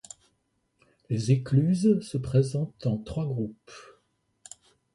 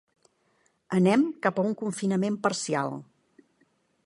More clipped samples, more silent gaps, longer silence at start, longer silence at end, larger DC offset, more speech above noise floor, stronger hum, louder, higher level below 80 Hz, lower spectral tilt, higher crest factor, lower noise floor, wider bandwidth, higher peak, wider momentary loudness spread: neither; neither; first, 1.1 s vs 0.9 s; about the same, 1.1 s vs 1 s; neither; first, 48 dB vs 44 dB; neither; about the same, -27 LUFS vs -27 LUFS; first, -56 dBFS vs -72 dBFS; first, -8 dB/octave vs -5.5 dB/octave; about the same, 18 dB vs 20 dB; first, -74 dBFS vs -69 dBFS; about the same, 11.5 kHz vs 11.5 kHz; about the same, -10 dBFS vs -8 dBFS; first, 24 LU vs 7 LU